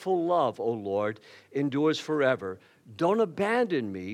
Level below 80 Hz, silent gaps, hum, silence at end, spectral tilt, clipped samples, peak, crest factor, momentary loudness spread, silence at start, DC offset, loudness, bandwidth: -80 dBFS; none; none; 0 s; -6 dB/octave; under 0.1%; -12 dBFS; 16 dB; 9 LU; 0 s; under 0.1%; -28 LUFS; 12.5 kHz